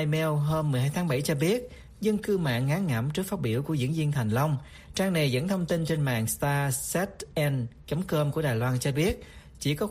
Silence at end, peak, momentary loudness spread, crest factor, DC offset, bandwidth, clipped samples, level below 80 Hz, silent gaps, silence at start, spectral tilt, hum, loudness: 0 s; -14 dBFS; 5 LU; 14 dB; under 0.1%; 15.5 kHz; under 0.1%; -50 dBFS; none; 0 s; -5.5 dB/octave; none; -28 LUFS